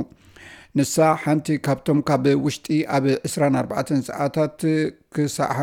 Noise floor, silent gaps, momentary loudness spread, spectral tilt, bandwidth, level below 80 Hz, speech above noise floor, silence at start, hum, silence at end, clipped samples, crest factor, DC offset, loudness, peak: -46 dBFS; none; 6 LU; -6 dB/octave; 16.5 kHz; -58 dBFS; 25 dB; 0 s; none; 0 s; under 0.1%; 16 dB; under 0.1%; -22 LUFS; -4 dBFS